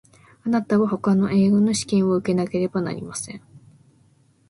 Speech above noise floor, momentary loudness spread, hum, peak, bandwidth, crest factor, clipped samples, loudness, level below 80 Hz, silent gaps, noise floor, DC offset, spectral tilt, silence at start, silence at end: 38 dB; 13 LU; none; -8 dBFS; 11.5 kHz; 14 dB; under 0.1%; -21 LUFS; -58 dBFS; none; -58 dBFS; under 0.1%; -6 dB/octave; 0.45 s; 0.9 s